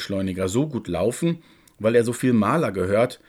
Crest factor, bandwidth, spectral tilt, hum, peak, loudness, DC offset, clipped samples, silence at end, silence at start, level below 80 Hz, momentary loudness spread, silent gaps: 16 dB; 16 kHz; -6 dB/octave; none; -6 dBFS; -22 LUFS; under 0.1%; under 0.1%; 0.15 s; 0 s; -60 dBFS; 6 LU; none